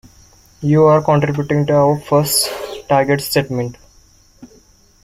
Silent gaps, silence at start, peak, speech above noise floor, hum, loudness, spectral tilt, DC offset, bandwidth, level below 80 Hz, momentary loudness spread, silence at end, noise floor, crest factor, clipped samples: none; 0.6 s; -2 dBFS; 35 dB; none; -15 LUFS; -5 dB/octave; under 0.1%; 16.5 kHz; -48 dBFS; 12 LU; 0.6 s; -49 dBFS; 14 dB; under 0.1%